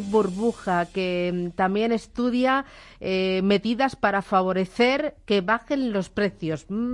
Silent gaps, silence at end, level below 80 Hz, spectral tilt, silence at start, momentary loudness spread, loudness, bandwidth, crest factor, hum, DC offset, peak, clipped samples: none; 0 s; -52 dBFS; -6 dB/octave; 0 s; 5 LU; -24 LUFS; 11 kHz; 16 dB; none; under 0.1%; -8 dBFS; under 0.1%